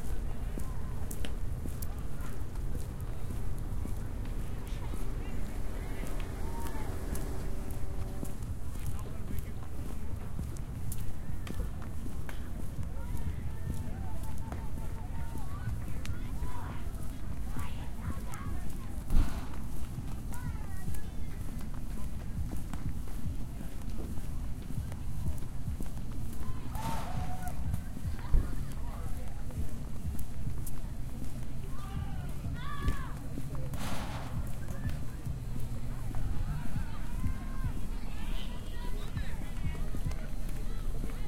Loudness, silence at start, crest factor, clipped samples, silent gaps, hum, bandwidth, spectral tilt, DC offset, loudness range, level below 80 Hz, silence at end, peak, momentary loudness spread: -40 LUFS; 0 s; 20 dB; under 0.1%; none; none; 16.5 kHz; -6 dB/octave; under 0.1%; 2 LU; -38 dBFS; 0 s; -12 dBFS; 4 LU